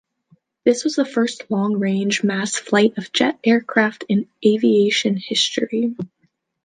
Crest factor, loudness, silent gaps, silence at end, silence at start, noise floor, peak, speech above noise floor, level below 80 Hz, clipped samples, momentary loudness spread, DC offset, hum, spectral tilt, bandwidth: 18 dB; -19 LUFS; none; 0.6 s; 0.65 s; -59 dBFS; -2 dBFS; 40 dB; -68 dBFS; under 0.1%; 6 LU; under 0.1%; none; -4.5 dB/octave; 9.6 kHz